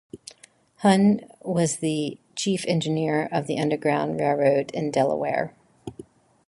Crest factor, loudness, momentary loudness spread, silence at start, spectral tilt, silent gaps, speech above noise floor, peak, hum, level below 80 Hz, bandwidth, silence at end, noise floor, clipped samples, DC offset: 18 dB; -24 LUFS; 21 LU; 0.15 s; -5.5 dB/octave; none; 32 dB; -6 dBFS; none; -64 dBFS; 11.5 kHz; 0.45 s; -55 dBFS; under 0.1%; under 0.1%